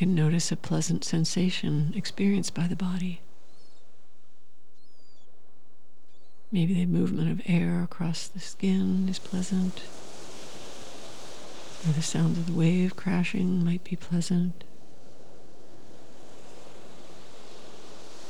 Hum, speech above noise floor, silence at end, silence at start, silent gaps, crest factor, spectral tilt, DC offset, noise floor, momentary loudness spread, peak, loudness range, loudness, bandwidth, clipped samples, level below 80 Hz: none; 40 dB; 0 s; 0 s; none; 16 dB; -6 dB/octave; 3%; -67 dBFS; 22 LU; -14 dBFS; 9 LU; -28 LUFS; 12 kHz; under 0.1%; -68 dBFS